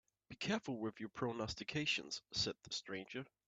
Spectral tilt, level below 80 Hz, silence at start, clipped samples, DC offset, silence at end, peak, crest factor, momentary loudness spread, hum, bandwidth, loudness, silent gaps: -3.5 dB/octave; -70 dBFS; 0.3 s; under 0.1%; under 0.1%; 0.2 s; -24 dBFS; 20 dB; 8 LU; none; 9 kHz; -42 LUFS; none